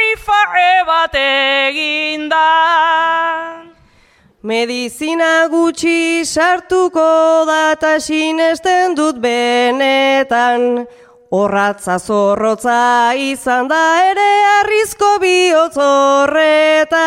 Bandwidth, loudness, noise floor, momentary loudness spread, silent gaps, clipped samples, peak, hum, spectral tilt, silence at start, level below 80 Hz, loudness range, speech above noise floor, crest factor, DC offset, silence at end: 16 kHz; -12 LUFS; -50 dBFS; 6 LU; none; under 0.1%; 0 dBFS; none; -3 dB/octave; 0 s; -50 dBFS; 4 LU; 37 dB; 12 dB; under 0.1%; 0 s